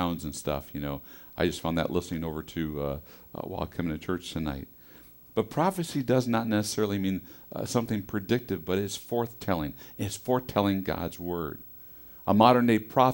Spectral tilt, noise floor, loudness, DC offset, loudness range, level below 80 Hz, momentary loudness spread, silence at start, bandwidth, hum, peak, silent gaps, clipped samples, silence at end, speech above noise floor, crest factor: -6 dB/octave; -52 dBFS; -29 LUFS; under 0.1%; 5 LU; -50 dBFS; 15 LU; 0 s; 16 kHz; none; -4 dBFS; none; under 0.1%; 0 s; 23 dB; 24 dB